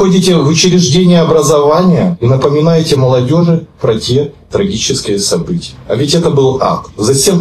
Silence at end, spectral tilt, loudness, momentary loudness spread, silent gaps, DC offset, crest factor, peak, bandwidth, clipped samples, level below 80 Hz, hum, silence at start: 0 s; -5.5 dB/octave; -10 LUFS; 7 LU; none; under 0.1%; 10 dB; 0 dBFS; 14.5 kHz; under 0.1%; -38 dBFS; none; 0 s